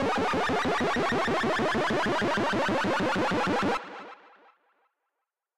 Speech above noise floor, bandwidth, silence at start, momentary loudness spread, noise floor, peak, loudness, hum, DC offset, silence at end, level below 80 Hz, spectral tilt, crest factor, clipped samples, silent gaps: 58 dB; 15.5 kHz; 0 s; 4 LU; -85 dBFS; -16 dBFS; -27 LUFS; none; under 0.1%; 0 s; -52 dBFS; -5 dB/octave; 12 dB; under 0.1%; none